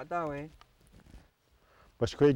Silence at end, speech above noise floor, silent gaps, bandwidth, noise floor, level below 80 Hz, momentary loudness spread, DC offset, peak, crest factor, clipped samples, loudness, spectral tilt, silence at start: 0 s; 37 dB; none; 10.5 kHz; -67 dBFS; -58 dBFS; 27 LU; under 0.1%; -14 dBFS; 18 dB; under 0.1%; -33 LUFS; -7 dB/octave; 0 s